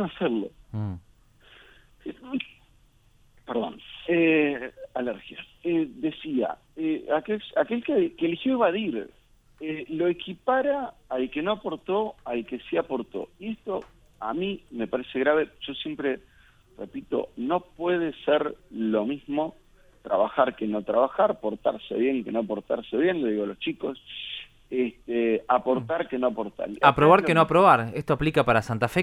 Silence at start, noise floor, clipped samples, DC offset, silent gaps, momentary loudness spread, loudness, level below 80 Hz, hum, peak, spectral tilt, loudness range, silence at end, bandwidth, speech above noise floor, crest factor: 0 s; -59 dBFS; under 0.1%; under 0.1%; none; 14 LU; -26 LUFS; -56 dBFS; none; -2 dBFS; -7 dB/octave; 9 LU; 0 s; 13 kHz; 34 dB; 24 dB